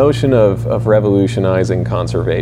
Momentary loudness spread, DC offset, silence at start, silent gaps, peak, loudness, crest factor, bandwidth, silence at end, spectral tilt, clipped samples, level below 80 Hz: 5 LU; under 0.1%; 0 s; none; 0 dBFS; -14 LUFS; 12 dB; 11 kHz; 0 s; -8 dB/octave; under 0.1%; -34 dBFS